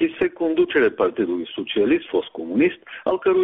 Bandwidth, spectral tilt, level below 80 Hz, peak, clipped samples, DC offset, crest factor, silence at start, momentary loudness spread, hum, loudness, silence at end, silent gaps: 3.9 kHz; -3.5 dB/octave; -60 dBFS; -8 dBFS; under 0.1%; under 0.1%; 14 dB; 0 s; 7 LU; none; -21 LUFS; 0 s; none